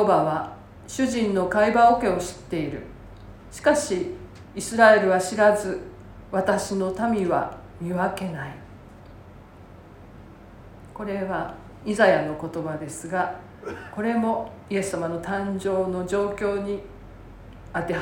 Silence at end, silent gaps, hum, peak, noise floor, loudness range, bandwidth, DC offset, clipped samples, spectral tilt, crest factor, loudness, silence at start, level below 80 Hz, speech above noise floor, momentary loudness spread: 0 s; none; none; -2 dBFS; -46 dBFS; 12 LU; 17 kHz; under 0.1%; under 0.1%; -5 dB/octave; 22 dB; -24 LUFS; 0 s; -50 dBFS; 23 dB; 19 LU